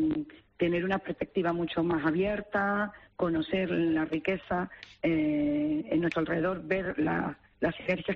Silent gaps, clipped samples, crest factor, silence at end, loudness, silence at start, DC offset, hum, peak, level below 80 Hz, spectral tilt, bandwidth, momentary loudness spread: none; under 0.1%; 14 dB; 0 s; -30 LUFS; 0 s; under 0.1%; none; -16 dBFS; -56 dBFS; -5.5 dB/octave; 6.2 kHz; 6 LU